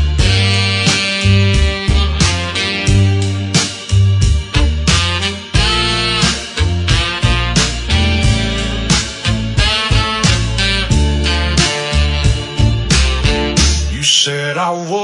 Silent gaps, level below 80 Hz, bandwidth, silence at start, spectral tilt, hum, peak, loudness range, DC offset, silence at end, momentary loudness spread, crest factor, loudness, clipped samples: none; -20 dBFS; 11 kHz; 0 s; -4 dB/octave; none; 0 dBFS; 1 LU; under 0.1%; 0 s; 4 LU; 14 dB; -13 LUFS; under 0.1%